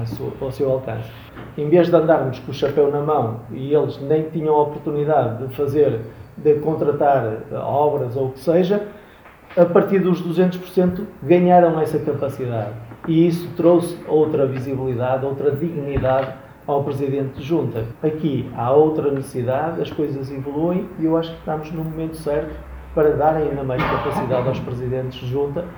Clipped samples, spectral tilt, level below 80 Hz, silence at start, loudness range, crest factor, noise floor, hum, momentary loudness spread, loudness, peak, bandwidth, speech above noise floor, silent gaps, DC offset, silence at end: under 0.1%; -8.5 dB/octave; -44 dBFS; 0 s; 4 LU; 20 dB; -45 dBFS; none; 11 LU; -20 LUFS; 0 dBFS; over 20 kHz; 25 dB; none; under 0.1%; 0 s